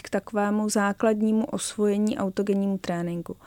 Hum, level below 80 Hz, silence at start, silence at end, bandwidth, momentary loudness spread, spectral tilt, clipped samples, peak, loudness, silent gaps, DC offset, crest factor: none; -60 dBFS; 0.05 s; 0.1 s; 16.5 kHz; 6 LU; -5.5 dB/octave; under 0.1%; -12 dBFS; -25 LUFS; none; under 0.1%; 14 dB